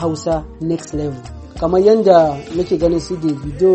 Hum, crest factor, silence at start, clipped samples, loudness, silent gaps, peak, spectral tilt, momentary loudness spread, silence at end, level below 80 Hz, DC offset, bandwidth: none; 16 dB; 0 s; under 0.1%; -16 LUFS; none; 0 dBFS; -7 dB/octave; 13 LU; 0 s; -36 dBFS; under 0.1%; 8.8 kHz